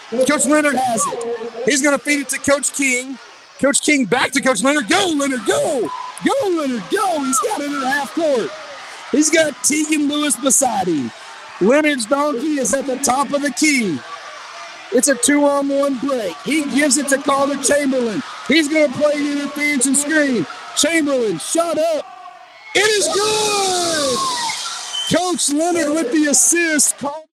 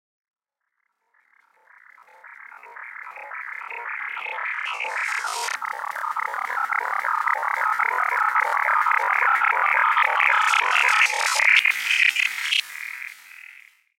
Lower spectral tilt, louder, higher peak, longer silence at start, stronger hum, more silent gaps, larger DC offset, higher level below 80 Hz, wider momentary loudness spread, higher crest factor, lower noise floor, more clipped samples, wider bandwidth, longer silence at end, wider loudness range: first, -2 dB/octave vs 4 dB/octave; first, -16 LUFS vs -20 LUFS; about the same, -2 dBFS vs -4 dBFS; second, 0 s vs 2.25 s; neither; neither; neither; first, -60 dBFS vs under -90 dBFS; second, 9 LU vs 17 LU; about the same, 16 dB vs 20 dB; second, -38 dBFS vs -78 dBFS; neither; about the same, 16 kHz vs 17 kHz; second, 0.1 s vs 0.4 s; second, 2 LU vs 16 LU